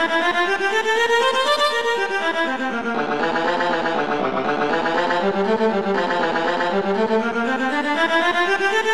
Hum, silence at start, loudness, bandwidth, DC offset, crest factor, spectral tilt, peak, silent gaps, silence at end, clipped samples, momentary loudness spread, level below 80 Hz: none; 0 s; -19 LUFS; 14 kHz; 1%; 14 dB; -4 dB/octave; -6 dBFS; none; 0 s; under 0.1%; 4 LU; -56 dBFS